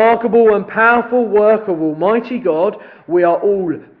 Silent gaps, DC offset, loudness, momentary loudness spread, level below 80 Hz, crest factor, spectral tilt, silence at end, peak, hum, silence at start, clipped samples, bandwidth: none; under 0.1%; -14 LUFS; 7 LU; -56 dBFS; 14 dB; -9.5 dB/octave; 0.2 s; 0 dBFS; none; 0 s; under 0.1%; 4.8 kHz